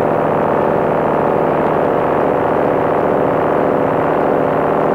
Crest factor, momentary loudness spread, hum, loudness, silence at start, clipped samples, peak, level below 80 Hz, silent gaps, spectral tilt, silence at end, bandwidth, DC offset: 10 dB; 0 LU; none; -15 LUFS; 0 s; under 0.1%; -4 dBFS; -44 dBFS; none; -8.5 dB/octave; 0 s; 16 kHz; under 0.1%